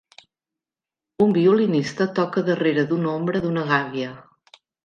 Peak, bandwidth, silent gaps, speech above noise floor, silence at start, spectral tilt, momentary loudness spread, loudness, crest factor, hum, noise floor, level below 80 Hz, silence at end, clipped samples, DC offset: -4 dBFS; 8.8 kHz; none; 69 dB; 1.2 s; -7 dB/octave; 6 LU; -21 LUFS; 18 dB; none; -89 dBFS; -62 dBFS; 0.65 s; under 0.1%; under 0.1%